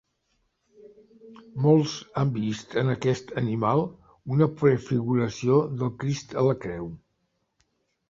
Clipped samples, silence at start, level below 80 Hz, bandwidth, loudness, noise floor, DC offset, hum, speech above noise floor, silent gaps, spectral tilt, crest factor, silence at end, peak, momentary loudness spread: under 0.1%; 1.25 s; -58 dBFS; 7.6 kHz; -25 LUFS; -75 dBFS; under 0.1%; none; 50 dB; none; -7.5 dB/octave; 18 dB; 1.15 s; -8 dBFS; 11 LU